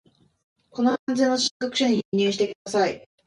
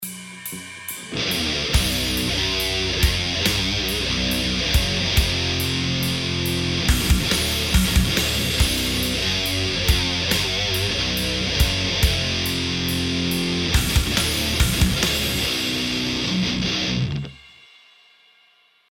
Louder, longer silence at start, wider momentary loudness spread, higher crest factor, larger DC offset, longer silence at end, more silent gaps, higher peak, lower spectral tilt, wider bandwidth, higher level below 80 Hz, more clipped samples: second, -23 LUFS vs -20 LUFS; first, 0.75 s vs 0 s; about the same, 4 LU vs 3 LU; about the same, 16 dB vs 18 dB; neither; second, 0.25 s vs 1.55 s; first, 0.99-1.07 s, 1.51-1.60 s, 2.05-2.12 s, 2.55-2.65 s vs none; second, -8 dBFS vs -4 dBFS; about the same, -4 dB/octave vs -3.5 dB/octave; second, 11.5 kHz vs 17.5 kHz; second, -68 dBFS vs -28 dBFS; neither